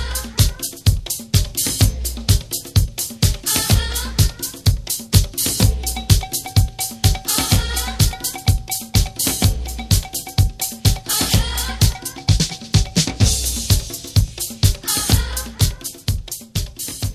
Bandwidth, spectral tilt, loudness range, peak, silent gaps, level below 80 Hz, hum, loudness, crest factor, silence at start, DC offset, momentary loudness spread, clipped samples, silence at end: 16 kHz; -3.5 dB/octave; 1 LU; 0 dBFS; none; -24 dBFS; none; -19 LUFS; 18 dB; 0 s; under 0.1%; 7 LU; under 0.1%; 0 s